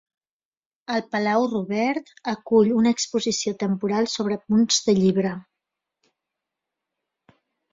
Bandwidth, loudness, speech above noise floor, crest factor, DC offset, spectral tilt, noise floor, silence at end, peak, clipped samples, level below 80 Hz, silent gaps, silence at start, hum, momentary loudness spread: 7.8 kHz; -22 LUFS; over 68 dB; 18 dB; under 0.1%; -4.5 dB/octave; under -90 dBFS; 2.3 s; -6 dBFS; under 0.1%; -64 dBFS; none; 0.9 s; none; 10 LU